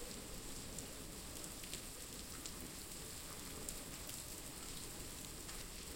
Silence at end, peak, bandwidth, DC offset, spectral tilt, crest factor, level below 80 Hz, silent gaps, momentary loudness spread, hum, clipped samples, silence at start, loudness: 0 s; -24 dBFS; 17 kHz; under 0.1%; -2.5 dB/octave; 26 dB; -58 dBFS; none; 2 LU; none; under 0.1%; 0 s; -48 LUFS